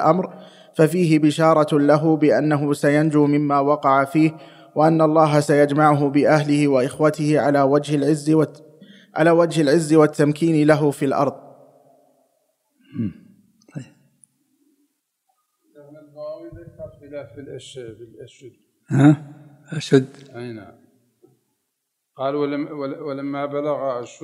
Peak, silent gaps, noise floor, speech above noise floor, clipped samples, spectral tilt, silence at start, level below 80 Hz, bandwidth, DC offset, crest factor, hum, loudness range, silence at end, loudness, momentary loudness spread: 0 dBFS; none; -77 dBFS; 59 dB; under 0.1%; -7 dB/octave; 0 s; -66 dBFS; 13 kHz; under 0.1%; 18 dB; none; 20 LU; 0.1 s; -18 LUFS; 21 LU